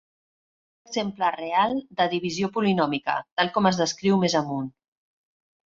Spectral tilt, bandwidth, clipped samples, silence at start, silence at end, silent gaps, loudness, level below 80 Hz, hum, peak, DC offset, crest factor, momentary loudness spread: -5 dB/octave; 7.8 kHz; under 0.1%; 0.9 s; 1.1 s; 3.32-3.37 s; -24 LUFS; -64 dBFS; none; -6 dBFS; under 0.1%; 20 dB; 8 LU